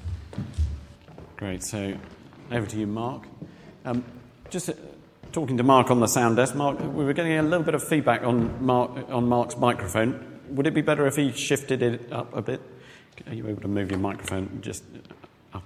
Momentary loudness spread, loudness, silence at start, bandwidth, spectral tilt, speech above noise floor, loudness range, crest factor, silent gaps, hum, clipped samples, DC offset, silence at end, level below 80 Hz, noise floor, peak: 18 LU; -25 LUFS; 0 s; 16 kHz; -5.5 dB/octave; 21 dB; 10 LU; 22 dB; none; none; under 0.1%; under 0.1%; 0 s; -44 dBFS; -46 dBFS; -4 dBFS